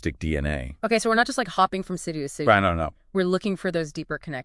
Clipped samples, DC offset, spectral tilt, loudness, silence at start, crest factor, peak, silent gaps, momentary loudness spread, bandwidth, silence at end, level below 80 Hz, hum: under 0.1%; under 0.1%; -5 dB/octave; -24 LUFS; 0.05 s; 22 dB; -2 dBFS; none; 11 LU; 12 kHz; 0 s; -42 dBFS; none